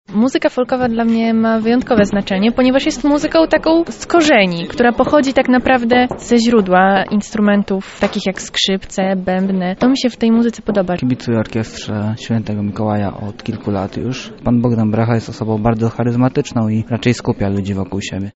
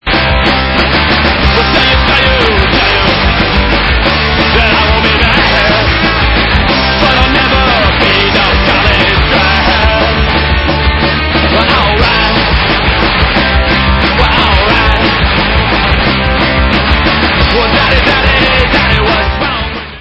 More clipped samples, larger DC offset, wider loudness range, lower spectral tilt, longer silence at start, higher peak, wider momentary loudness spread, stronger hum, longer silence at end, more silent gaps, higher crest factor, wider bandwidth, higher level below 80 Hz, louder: second, under 0.1% vs 0.4%; neither; first, 6 LU vs 1 LU; second, -5 dB/octave vs -6.5 dB/octave; about the same, 0.1 s vs 0.05 s; about the same, 0 dBFS vs 0 dBFS; first, 9 LU vs 2 LU; neither; about the same, 0.05 s vs 0 s; neither; first, 14 dB vs 8 dB; about the same, 8 kHz vs 8 kHz; second, -40 dBFS vs -16 dBFS; second, -15 LUFS vs -8 LUFS